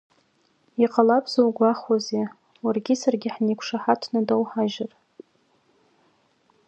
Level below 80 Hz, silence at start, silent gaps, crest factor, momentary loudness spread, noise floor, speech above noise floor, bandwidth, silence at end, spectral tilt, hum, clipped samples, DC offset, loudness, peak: -76 dBFS; 0.8 s; none; 22 dB; 10 LU; -65 dBFS; 43 dB; 8.2 kHz; 1.8 s; -5.5 dB/octave; none; under 0.1%; under 0.1%; -23 LUFS; -4 dBFS